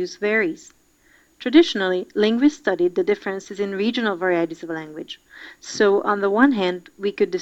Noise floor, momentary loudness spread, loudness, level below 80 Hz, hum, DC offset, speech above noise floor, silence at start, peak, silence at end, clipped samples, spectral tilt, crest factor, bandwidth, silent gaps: -57 dBFS; 16 LU; -21 LUFS; -62 dBFS; none; under 0.1%; 36 dB; 0 s; 0 dBFS; 0 s; under 0.1%; -5 dB/octave; 20 dB; 8.2 kHz; none